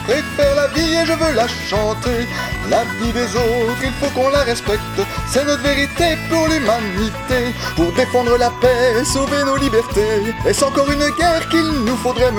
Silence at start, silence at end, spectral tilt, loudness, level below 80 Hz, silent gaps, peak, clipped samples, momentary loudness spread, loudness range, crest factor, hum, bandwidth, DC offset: 0 s; 0 s; -4.5 dB/octave; -17 LUFS; -32 dBFS; none; 0 dBFS; under 0.1%; 5 LU; 2 LU; 16 dB; none; 18 kHz; under 0.1%